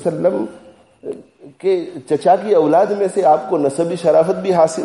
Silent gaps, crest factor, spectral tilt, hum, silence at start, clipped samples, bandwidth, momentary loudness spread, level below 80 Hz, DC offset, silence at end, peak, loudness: none; 14 dB; -6.5 dB/octave; none; 0 s; under 0.1%; 11.5 kHz; 17 LU; -64 dBFS; under 0.1%; 0 s; -2 dBFS; -16 LUFS